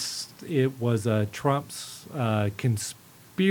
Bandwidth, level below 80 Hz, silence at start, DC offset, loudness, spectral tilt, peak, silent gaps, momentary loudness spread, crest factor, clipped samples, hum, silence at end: 19 kHz; -66 dBFS; 0 s; under 0.1%; -28 LUFS; -5.5 dB/octave; -8 dBFS; none; 11 LU; 18 dB; under 0.1%; none; 0 s